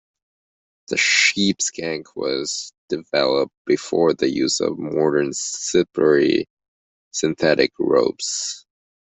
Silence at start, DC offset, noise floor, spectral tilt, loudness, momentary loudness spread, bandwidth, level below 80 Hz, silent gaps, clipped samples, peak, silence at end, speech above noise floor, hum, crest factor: 0.9 s; under 0.1%; under -90 dBFS; -3 dB/octave; -20 LUFS; 11 LU; 8.4 kHz; -60 dBFS; 2.78-2.88 s, 3.57-3.65 s, 6.50-6.57 s, 6.68-7.11 s; under 0.1%; -2 dBFS; 0.55 s; over 70 dB; none; 18 dB